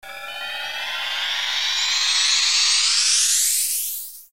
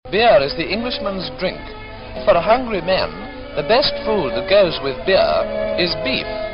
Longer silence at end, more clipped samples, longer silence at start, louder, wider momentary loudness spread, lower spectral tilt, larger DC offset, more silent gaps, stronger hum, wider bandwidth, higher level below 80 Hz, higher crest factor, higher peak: about the same, 0 s vs 0 s; neither; about the same, 0.05 s vs 0.05 s; about the same, -18 LUFS vs -18 LUFS; about the same, 12 LU vs 11 LU; second, 5 dB/octave vs -8.5 dB/octave; first, 0.6% vs under 0.1%; neither; neither; first, 16 kHz vs 5.8 kHz; second, -70 dBFS vs -38 dBFS; about the same, 16 dB vs 14 dB; about the same, -6 dBFS vs -4 dBFS